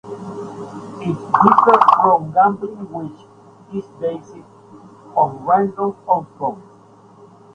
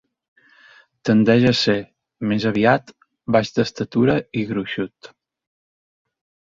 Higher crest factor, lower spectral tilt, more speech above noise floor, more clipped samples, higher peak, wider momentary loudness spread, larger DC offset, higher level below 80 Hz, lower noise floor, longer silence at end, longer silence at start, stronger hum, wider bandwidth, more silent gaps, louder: about the same, 18 dB vs 20 dB; first, -8 dB/octave vs -6.5 dB/octave; about the same, 30 dB vs 33 dB; neither; about the same, 0 dBFS vs -2 dBFS; first, 20 LU vs 13 LU; neither; second, -60 dBFS vs -54 dBFS; second, -46 dBFS vs -51 dBFS; second, 0.95 s vs 1.65 s; second, 0.05 s vs 1.05 s; neither; first, 9.8 kHz vs 7.6 kHz; neither; first, -16 LUFS vs -19 LUFS